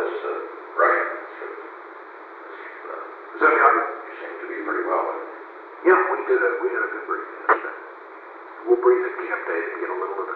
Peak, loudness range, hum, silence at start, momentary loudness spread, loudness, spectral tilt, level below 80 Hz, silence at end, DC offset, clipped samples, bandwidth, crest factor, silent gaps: -2 dBFS; 3 LU; none; 0 s; 21 LU; -22 LUFS; -6 dB/octave; -86 dBFS; 0 s; under 0.1%; under 0.1%; 4.4 kHz; 22 dB; none